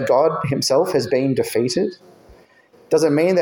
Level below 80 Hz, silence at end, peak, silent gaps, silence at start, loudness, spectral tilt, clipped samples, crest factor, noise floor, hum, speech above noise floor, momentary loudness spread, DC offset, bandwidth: -56 dBFS; 0 s; -4 dBFS; none; 0 s; -19 LUFS; -5 dB/octave; under 0.1%; 14 dB; -51 dBFS; none; 34 dB; 5 LU; under 0.1%; 17 kHz